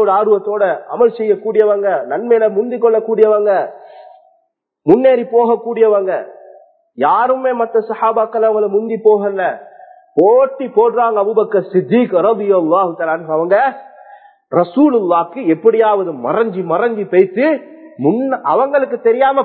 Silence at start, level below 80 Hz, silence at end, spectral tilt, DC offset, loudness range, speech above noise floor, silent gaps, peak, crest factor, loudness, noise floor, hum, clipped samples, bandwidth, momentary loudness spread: 0 s; -66 dBFS; 0 s; -10 dB/octave; under 0.1%; 2 LU; 50 dB; none; 0 dBFS; 14 dB; -14 LUFS; -63 dBFS; none; under 0.1%; 4.4 kHz; 6 LU